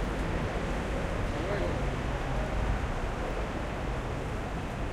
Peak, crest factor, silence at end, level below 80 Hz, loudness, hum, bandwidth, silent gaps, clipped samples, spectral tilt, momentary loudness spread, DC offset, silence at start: -18 dBFS; 14 dB; 0 s; -36 dBFS; -33 LUFS; none; 13 kHz; none; under 0.1%; -6.5 dB/octave; 3 LU; under 0.1%; 0 s